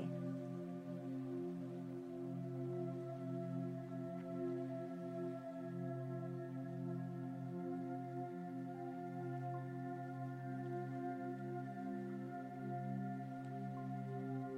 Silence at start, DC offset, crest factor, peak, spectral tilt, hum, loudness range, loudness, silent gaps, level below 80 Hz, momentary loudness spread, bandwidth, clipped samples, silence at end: 0 s; under 0.1%; 12 dB; -34 dBFS; -9.5 dB/octave; none; 1 LU; -46 LUFS; none; -84 dBFS; 3 LU; 9.6 kHz; under 0.1%; 0 s